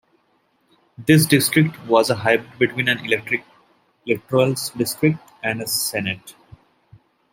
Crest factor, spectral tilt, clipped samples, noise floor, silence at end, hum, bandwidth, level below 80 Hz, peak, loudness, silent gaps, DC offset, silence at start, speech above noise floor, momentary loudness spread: 20 dB; -4.5 dB/octave; under 0.1%; -64 dBFS; 1 s; none; 16.5 kHz; -60 dBFS; -2 dBFS; -19 LUFS; none; under 0.1%; 1 s; 45 dB; 10 LU